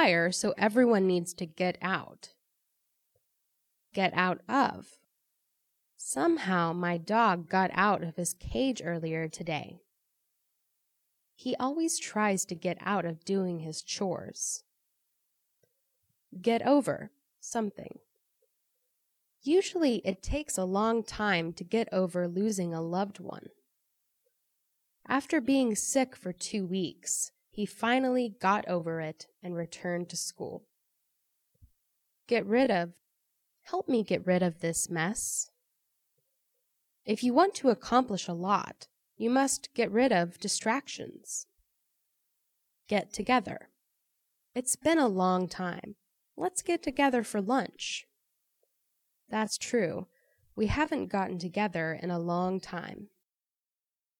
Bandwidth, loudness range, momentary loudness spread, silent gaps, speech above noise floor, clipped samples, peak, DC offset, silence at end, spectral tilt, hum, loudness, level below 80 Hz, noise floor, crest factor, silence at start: 18 kHz; 6 LU; 13 LU; none; over 60 dB; under 0.1%; -10 dBFS; under 0.1%; 1.15 s; -4 dB/octave; none; -30 LUFS; -58 dBFS; under -90 dBFS; 22 dB; 0 s